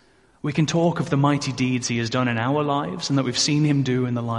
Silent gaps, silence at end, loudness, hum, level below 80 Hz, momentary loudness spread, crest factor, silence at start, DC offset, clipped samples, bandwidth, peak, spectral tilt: none; 0 s; -22 LUFS; none; -56 dBFS; 4 LU; 16 dB; 0.45 s; under 0.1%; under 0.1%; 11.5 kHz; -6 dBFS; -5 dB/octave